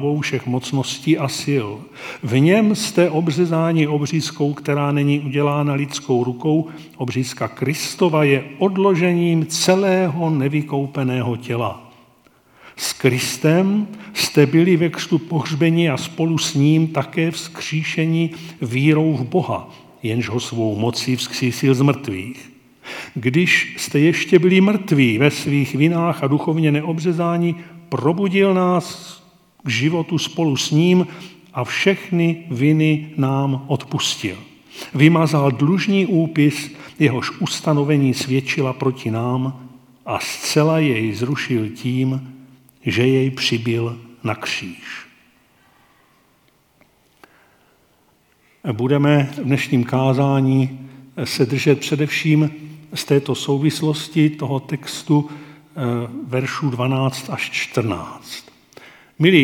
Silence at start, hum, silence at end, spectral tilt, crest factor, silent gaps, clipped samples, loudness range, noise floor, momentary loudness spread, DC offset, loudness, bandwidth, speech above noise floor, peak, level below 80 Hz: 0 s; none; 0 s; -5.5 dB/octave; 18 dB; none; under 0.1%; 5 LU; -58 dBFS; 12 LU; under 0.1%; -19 LUFS; 17.5 kHz; 40 dB; 0 dBFS; -64 dBFS